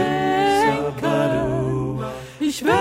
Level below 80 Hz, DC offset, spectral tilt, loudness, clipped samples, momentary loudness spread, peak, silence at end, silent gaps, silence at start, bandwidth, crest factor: -44 dBFS; under 0.1%; -5.5 dB/octave; -21 LUFS; under 0.1%; 9 LU; -4 dBFS; 0 s; none; 0 s; 16 kHz; 16 dB